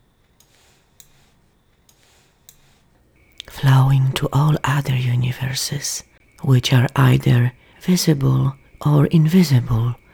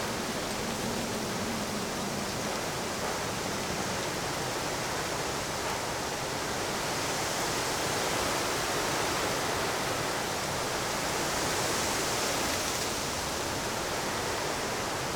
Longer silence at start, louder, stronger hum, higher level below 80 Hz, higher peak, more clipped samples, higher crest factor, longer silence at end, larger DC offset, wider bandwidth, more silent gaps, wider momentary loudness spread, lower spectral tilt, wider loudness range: first, 3.55 s vs 0 s; first, -18 LUFS vs -30 LUFS; neither; first, -44 dBFS vs -52 dBFS; first, -2 dBFS vs -16 dBFS; neither; about the same, 18 dB vs 14 dB; first, 0.2 s vs 0 s; neither; second, 18 kHz vs over 20 kHz; neither; first, 10 LU vs 4 LU; first, -6 dB/octave vs -2.5 dB/octave; about the same, 5 LU vs 3 LU